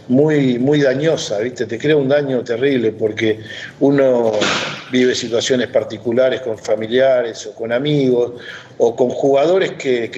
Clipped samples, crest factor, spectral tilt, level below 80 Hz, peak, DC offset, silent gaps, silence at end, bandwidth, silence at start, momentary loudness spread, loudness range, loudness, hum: under 0.1%; 16 dB; -5.5 dB/octave; -62 dBFS; 0 dBFS; under 0.1%; none; 0 s; 8.4 kHz; 0.1 s; 7 LU; 1 LU; -16 LUFS; none